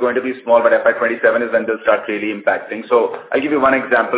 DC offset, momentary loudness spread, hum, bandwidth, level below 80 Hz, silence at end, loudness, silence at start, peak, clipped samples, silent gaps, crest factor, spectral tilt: under 0.1%; 6 LU; none; 4 kHz; -58 dBFS; 0 s; -16 LUFS; 0 s; 0 dBFS; under 0.1%; none; 16 dB; -8.5 dB/octave